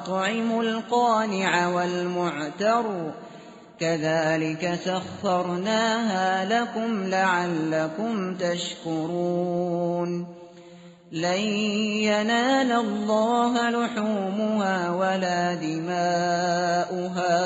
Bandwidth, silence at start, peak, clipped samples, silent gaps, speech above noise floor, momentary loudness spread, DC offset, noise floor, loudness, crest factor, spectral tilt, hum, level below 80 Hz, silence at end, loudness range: 8 kHz; 0 s; -8 dBFS; under 0.1%; none; 23 dB; 7 LU; under 0.1%; -47 dBFS; -25 LUFS; 16 dB; -4 dB/octave; none; -68 dBFS; 0 s; 4 LU